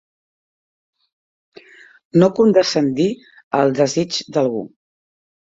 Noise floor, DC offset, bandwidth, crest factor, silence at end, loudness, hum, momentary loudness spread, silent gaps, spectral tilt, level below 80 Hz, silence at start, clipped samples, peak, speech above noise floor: -45 dBFS; under 0.1%; 8 kHz; 18 dB; 0.9 s; -17 LUFS; none; 11 LU; 3.44-3.51 s; -5.5 dB/octave; -60 dBFS; 2.15 s; under 0.1%; -2 dBFS; 29 dB